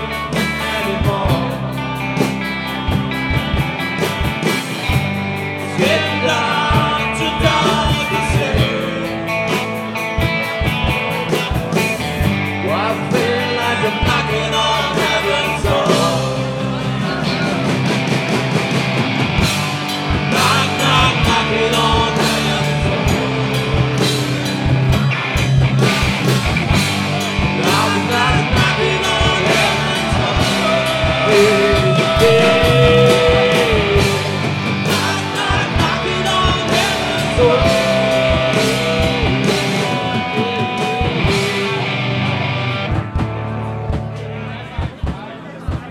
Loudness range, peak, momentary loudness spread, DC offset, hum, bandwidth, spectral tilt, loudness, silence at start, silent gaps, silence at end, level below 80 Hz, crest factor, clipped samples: 6 LU; 0 dBFS; 8 LU; under 0.1%; none; 17 kHz; -5 dB/octave; -16 LUFS; 0 s; none; 0 s; -30 dBFS; 14 dB; under 0.1%